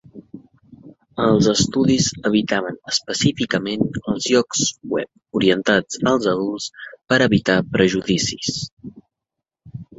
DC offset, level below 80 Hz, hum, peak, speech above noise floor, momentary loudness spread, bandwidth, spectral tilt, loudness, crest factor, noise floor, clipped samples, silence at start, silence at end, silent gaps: under 0.1%; -50 dBFS; none; -2 dBFS; 65 dB; 11 LU; 8.2 kHz; -4 dB/octave; -19 LUFS; 18 dB; -84 dBFS; under 0.1%; 0.15 s; 0.15 s; 8.72-8.77 s